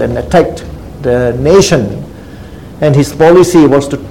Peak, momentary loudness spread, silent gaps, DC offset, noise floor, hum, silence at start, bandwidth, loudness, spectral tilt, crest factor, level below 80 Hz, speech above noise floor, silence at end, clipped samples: 0 dBFS; 23 LU; none; 0.8%; -28 dBFS; none; 0 s; 16.5 kHz; -9 LUFS; -6 dB/octave; 10 dB; -30 dBFS; 20 dB; 0 s; 2%